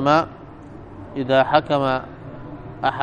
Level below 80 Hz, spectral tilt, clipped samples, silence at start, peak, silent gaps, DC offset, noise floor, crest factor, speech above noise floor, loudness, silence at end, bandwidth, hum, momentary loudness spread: -48 dBFS; -6.5 dB/octave; under 0.1%; 0 s; -2 dBFS; none; under 0.1%; -39 dBFS; 20 dB; 20 dB; -20 LUFS; 0 s; 9.4 kHz; none; 22 LU